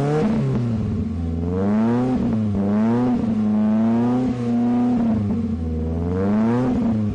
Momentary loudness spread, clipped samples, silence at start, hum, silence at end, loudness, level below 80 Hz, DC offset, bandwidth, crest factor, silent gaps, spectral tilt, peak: 5 LU; under 0.1%; 0 s; none; 0 s; -20 LUFS; -40 dBFS; under 0.1%; 7.6 kHz; 6 dB; none; -9.5 dB/octave; -12 dBFS